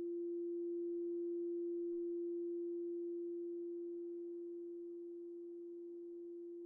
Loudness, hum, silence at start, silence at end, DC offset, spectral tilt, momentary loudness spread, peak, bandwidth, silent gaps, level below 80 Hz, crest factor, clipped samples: -45 LUFS; none; 0 s; 0 s; under 0.1%; -9.5 dB/octave; 9 LU; -38 dBFS; 1.1 kHz; none; under -90 dBFS; 6 dB; under 0.1%